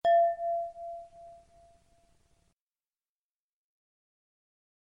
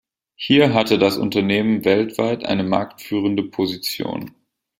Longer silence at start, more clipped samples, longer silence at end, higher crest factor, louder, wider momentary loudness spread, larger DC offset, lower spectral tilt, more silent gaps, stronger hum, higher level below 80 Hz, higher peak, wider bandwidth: second, 0.05 s vs 0.4 s; neither; first, 3.65 s vs 0.5 s; about the same, 18 dB vs 18 dB; second, -30 LUFS vs -19 LUFS; first, 27 LU vs 11 LU; neither; second, -4 dB/octave vs -5.5 dB/octave; neither; neither; second, -72 dBFS vs -56 dBFS; second, -18 dBFS vs -2 dBFS; second, 5.4 kHz vs 16.5 kHz